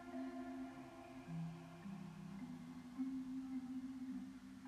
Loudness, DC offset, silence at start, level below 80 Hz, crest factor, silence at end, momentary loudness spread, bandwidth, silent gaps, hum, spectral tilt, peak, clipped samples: -50 LUFS; under 0.1%; 0 s; -74 dBFS; 14 dB; 0 s; 7 LU; 13 kHz; none; none; -7 dB/octave; -34 dBFS; under 0.1%